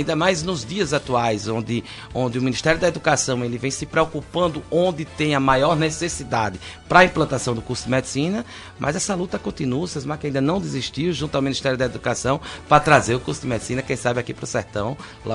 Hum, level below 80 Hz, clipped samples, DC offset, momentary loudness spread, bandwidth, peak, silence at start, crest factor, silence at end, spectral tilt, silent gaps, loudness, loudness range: none; -44 dBFS; under 0.1%; under 0.1%; 9 LU; 11 kHz; 0 dBFS; 0 s; 22 dB; 0 s; -4.5 dB/octave; none; -21 LUFS; 4 LU